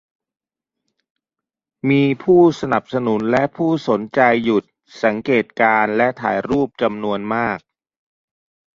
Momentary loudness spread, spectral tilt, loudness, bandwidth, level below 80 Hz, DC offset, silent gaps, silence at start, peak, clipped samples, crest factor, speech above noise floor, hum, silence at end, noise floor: 7 LU; -7 dB/octave; -18 LUFS; 7.4 kHz; -56 dBFS; under 0.1%; none; 1.85 s; -2 dBFS; under 0.1%; 18 dB; 72 dB; none; 1.15 s; -89 dBFS